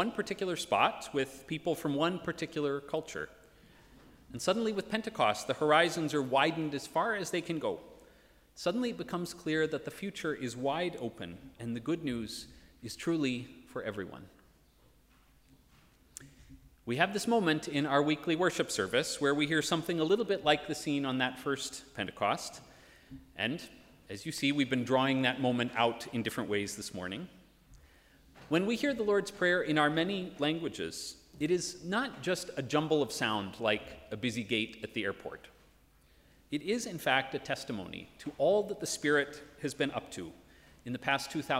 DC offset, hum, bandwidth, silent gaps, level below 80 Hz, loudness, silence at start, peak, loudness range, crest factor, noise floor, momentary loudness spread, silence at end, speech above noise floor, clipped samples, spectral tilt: under 0.1%; none; 16 kHz; none; -66 dBFS; -33 LUFS; 0 s; -10 dBFS; 7 LU; 22 dB; -64 dBFS; 15 LU; 0 s; 32 dB; under 0.1%; -4.5 dB/octave